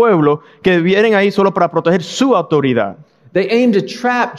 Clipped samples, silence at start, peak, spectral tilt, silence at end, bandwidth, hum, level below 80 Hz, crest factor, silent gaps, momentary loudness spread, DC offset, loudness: under 0.1%; 0 s; 0 dBFS; -6 dB/octave; 0 s; 12 kHz; none; -56 dBFS; 12 dB; none; 6 LU; under 0.1%; -14 LUFS